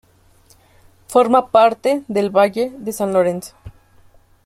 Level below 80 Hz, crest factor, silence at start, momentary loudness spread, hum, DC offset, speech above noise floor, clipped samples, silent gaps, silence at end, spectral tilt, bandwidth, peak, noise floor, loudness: -54 dBFS; 16 dB; 1.1 s; 10 LU; none; under 0.1%; 36 dB; under 0.1%; none; 0.75 s; -5.5 dB/octave; 16.5 kHz; -2 dBFS; -52 dBFS; -16 LUFS